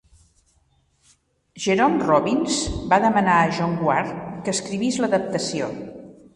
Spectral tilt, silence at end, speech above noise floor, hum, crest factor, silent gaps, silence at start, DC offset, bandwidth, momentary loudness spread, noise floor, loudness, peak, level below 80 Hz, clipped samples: -4.5 dB/octave; 0.25 s; 43 dB; none; 20 dB; none; 1.55 s; under 0.1%; 11.5 kHz; 12 LU; -63 dBFS; -21 LUFS; -2 dBFS; -46 dBFS; under 0.1%